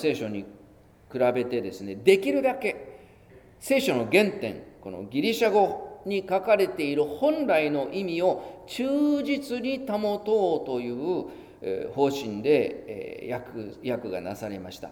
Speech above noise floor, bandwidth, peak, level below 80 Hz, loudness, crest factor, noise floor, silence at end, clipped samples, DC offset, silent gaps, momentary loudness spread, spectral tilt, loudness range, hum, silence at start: 28 dB; 18.5 kHz; -4 dBFS; -62 dBFS; -26 LUFS; 22 dB; -54 dBFS; 0 s; under 0.1%; under 0.1%; none; 15 LU; -5.5 dB/octave; 4 LU; none; 0 s